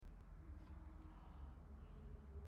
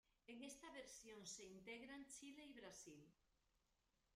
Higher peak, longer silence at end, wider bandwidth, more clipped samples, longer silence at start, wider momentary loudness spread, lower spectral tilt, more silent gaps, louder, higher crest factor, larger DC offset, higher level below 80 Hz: about the same, -44 dBFS vs -44 dBFS; about the same, 0 s vs 0 s; second, 8.2 kHz vs 15 kHz; neither; second, 0 s vs 0.3 s; second, 2 LU vs 5 LU; first, -8.5 dB/octave vs -2.5 dB/octave; neither; about the same, -60 LUFS vs -59 LUFS; second, 12 dB vs 18 dB; neither; first, -58 dBFS vs -84 dBFS